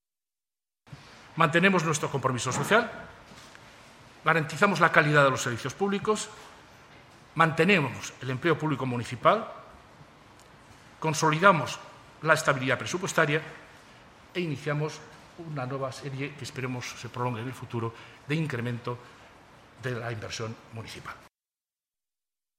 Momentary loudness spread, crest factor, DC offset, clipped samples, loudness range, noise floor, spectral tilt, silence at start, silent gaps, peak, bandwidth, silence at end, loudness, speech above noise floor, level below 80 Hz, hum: 20 LU; 28 dB; under 0.1%; under 0.1%; 10 LU; under -90 dBFS; -5 dB/octave; 0.9 s; none; -2 dBFS; 16 kHz; 1.4 s; -27 LUFS; over 63 dB; -64 dBFS; none